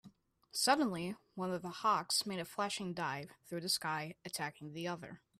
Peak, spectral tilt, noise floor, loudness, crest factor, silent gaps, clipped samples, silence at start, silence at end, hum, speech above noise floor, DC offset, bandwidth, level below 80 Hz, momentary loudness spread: -16 dBFS; -3 dB/octave; -64 dBFS; -37 LUFS; 22 dB; none; under 0.1%; 0.05 s; 0.25 s; none; 26 dB; under 0.1%; 15.5 kHz; -78 dBFS; 11 LU